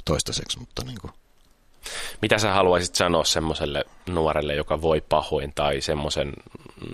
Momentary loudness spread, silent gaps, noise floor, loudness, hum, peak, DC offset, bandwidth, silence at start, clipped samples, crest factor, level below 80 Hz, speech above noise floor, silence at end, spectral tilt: 15 LU; none; -57 dBFS; -24 LUFS; none; -2 dBFS; under 0.1%; 14.5 kHz; 0 s; under 0.1%; 22 dB; -42 dBFS; 33 dB; 0 s; -3.5 dB/octave